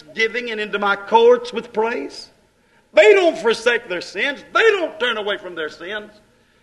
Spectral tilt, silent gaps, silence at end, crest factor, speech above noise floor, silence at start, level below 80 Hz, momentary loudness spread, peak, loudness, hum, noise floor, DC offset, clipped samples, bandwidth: -3 dB/octave; none; 0.55 s; 18 dB; 39 dB; 0.1 s; -62 dBFS; 15 LU; 0 dBFS; -18 LUFS; none; -57 dBFS; under 0.1%; under 0.1%; 11.5 kHz